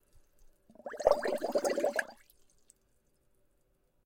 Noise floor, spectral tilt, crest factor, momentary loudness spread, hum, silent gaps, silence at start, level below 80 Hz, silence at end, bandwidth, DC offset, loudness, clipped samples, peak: -73 dBFS; -3 dB/octave; 26 dB; 19 LU; none; none; 0.85 s; -62 dBFS; 1.9 s; 16.5 kHz; under 0.1%; -32 LUFS; under 0.1%; -10 dBFS